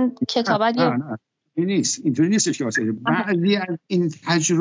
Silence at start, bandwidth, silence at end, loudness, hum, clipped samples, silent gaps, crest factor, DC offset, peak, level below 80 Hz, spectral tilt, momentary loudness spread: 0 s; 7.8 kHz; 0 s; -21 LUFS; none; under 0.1%; none; 16 dB; under 0.1%; -6 dBFS; -70 dBFS; -4.5 dB/octave; 7 LU